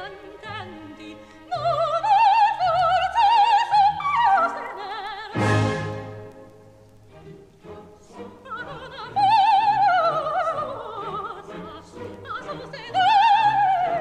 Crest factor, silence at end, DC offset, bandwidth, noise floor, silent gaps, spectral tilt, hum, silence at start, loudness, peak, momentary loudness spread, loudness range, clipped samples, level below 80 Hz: 14 dB; 0 s; under 0.1%; 10 kHz; -49 dBFS; none; -5 dB/octave; none; 0 s; -20 LUFS; -8 dBFS; 21 LU; 10 LU; under 0.1%; -54 dBFS